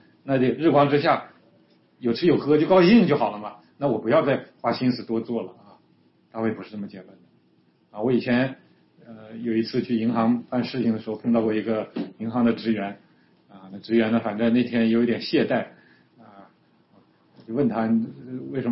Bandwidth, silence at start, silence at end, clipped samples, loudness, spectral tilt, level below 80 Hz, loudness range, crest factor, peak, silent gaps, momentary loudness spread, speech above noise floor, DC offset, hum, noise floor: 5.8 kHz; 0.25 s; 0 s; under 0.1%; -23 LUFS; -10.5 dB/octave; -64 dBFS; 8 LU; 18 dB; -6 dBFS; none; 15 LU; 40 dB; under 0.1%; none; -62 dBFS